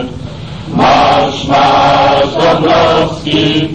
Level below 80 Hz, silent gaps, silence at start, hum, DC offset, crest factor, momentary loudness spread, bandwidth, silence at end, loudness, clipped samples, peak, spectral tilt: -34 dBFS; none; 0 s; none; 1%; 10 dB; 14 LU; 9.4 kHz; 0 s; -9 LUFS; under 0.1%; 0 dBFS; -5.5 dB/octave